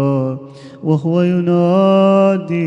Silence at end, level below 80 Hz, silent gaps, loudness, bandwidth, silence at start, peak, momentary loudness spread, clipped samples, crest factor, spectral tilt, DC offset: 0 s; -60 dBFS; none; -14 LUFS; 7.8 kHz; 0 s; -2 dBFS; 12 LU; under 0.1%; 12 dB; -9 dB/octave; under 0.1%